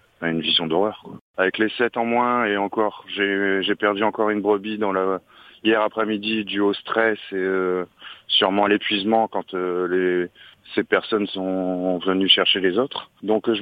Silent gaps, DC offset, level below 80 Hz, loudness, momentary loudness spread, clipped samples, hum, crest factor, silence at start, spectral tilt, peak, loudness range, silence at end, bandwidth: 1.21-1.34 s; under 0.1%; -66 dBFS; -21 LUFS; 8 LU; under 0.1%; none; 22 dB; 0.2 s; -7 dB/octave; 0 dBFS; 2 LU; 0 s; 5.2 kHz